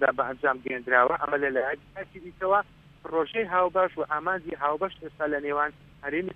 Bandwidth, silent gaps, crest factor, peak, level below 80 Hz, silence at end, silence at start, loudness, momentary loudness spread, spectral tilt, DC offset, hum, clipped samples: 4.7 kHz; none; 20 dB; -6 dBFS; -60 dBFS; 0 s; 0 s; -27 LUFS; 13 LU; -7 dB/octave; under 0.1%; none; under 0.1%